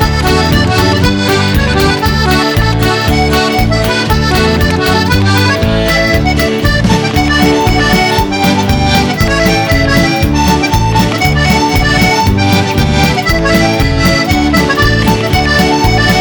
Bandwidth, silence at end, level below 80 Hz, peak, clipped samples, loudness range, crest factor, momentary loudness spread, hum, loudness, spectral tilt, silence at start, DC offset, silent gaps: over 20 kHz; 0 s; -18 dBFS; 0 dBFS; under 0.1%; 1 LU; 10 dB; 2 LU; none; -9 LUFS; -5 dB/octave; 0 s; under 0.1%; none